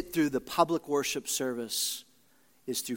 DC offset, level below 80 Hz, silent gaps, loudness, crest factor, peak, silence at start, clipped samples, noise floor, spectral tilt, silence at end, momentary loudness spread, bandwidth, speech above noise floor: under 0.1%; -64 dBFS; none; -30 LUFS; 22 dB; -10 dBFS; 0 s; under 0.1%; -66 dBFS; -3 dB/octave; 0 s; 8 LU; 17 kHz; 36 dB